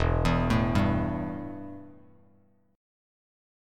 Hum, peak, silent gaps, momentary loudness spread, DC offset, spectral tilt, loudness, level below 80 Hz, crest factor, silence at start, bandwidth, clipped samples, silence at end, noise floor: none; -10 dBFS; none; 17 LU; under 0.1%; -7.5 dB/octave; -27 LUFS; -38 dBFS; 20 dB; 0 s; 13 kHz; under 0.1%; 1.8 s; -64 dBFS